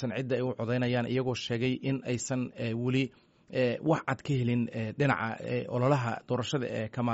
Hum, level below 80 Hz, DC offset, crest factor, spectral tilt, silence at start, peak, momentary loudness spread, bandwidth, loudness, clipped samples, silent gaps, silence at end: none; -64 dBFS; under 0.1%; 18 dB; -5.5 dB/octave; 0 s; -12 dBFS; 5 LU; 8 kHz; -31 LUFS; under 0.1%; none; 0 s